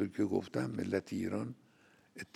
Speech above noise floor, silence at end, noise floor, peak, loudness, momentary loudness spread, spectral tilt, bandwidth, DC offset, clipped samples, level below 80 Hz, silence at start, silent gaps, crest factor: 30 dB; 0.1 s; -66 dBFS; -18 dBFS; -37 LUFS; 18 LU; -7 dB/octave; 14.5 kHz; under 0.1%; under 0.1%; -78 dBFS; 0 s; none; 18 dB